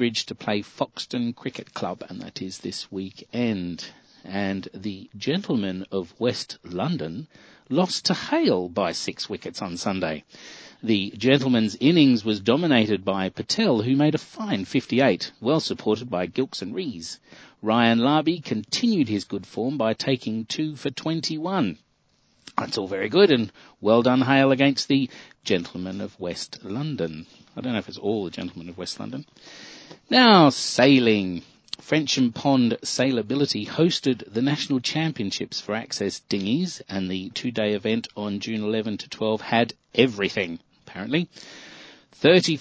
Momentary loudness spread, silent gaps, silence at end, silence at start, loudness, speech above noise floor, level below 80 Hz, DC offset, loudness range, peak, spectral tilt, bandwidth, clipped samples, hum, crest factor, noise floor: 16 LU; none; 0 s; 0 s; -23 LUFS; 42 dB; -60 dBFS; under 0.1%; 10 LU; -2 dBFS; -5 dB/octave; 8 kHz; under 0.1%; none; 22 dB; -65 dBFS